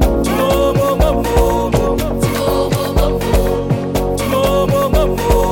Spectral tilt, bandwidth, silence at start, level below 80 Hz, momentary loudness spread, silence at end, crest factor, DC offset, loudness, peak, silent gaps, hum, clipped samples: -6 dB/octave; 17 kHz; 0 s; -20 dBFS; 3 LU; 0 s; 14 dB; under 0.1%; -15 LUFS; 0 dBFS; none; none; under 0.1%